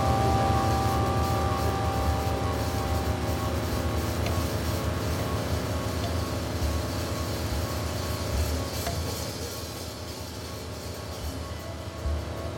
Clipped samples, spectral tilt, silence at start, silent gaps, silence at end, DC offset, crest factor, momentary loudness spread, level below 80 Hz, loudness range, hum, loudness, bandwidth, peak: under 0.1%; -5.5 dB/octave; 0 s; none; 0 s; under 0.1%; 16 dB; 11 LU; -36 dBFS; 7 LU; none; -29 LUFS; 17 kHz; -12 dBFS